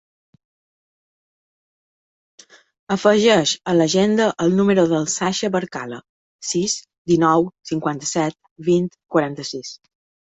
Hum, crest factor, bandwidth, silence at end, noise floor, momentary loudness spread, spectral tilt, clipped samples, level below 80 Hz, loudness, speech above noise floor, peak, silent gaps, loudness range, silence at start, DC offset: none; 18 dB; 8.4 kHz; 0.6 s; under -90 dBFS; 14 LU; -4.5 dB/octave; under 0.1%; -60 dBFS; -19 LUFS; over 71 dB; -2 dBFS; 6.09-6.39 s, 6.98-7.05 s, 8.51-8.56 s; 4 LU; 2.9 s; under 0.1%